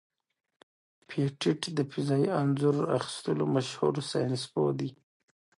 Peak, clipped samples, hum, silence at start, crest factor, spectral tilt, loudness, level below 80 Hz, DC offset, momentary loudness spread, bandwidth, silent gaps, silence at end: -14 dBFS; under 0.1%; none; 1.1 s; 18 dB; -6.5 dB/octave; -30 LUFS; -72 dBFS; under 0.1%; 6 LU; 11.5 kHz; none; 0.65 s